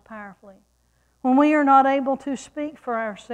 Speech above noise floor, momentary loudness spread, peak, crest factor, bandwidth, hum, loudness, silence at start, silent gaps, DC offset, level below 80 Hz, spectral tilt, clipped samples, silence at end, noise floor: 44 dB; 21 LU; -4 dBFS; 18 dB; 9.6 kHz; none; -20 LUFS; 0.1 s; none; under 0.1%; -64 dBFS; -5 dB/octave; under 0.1%; 0 s; -65 dBFS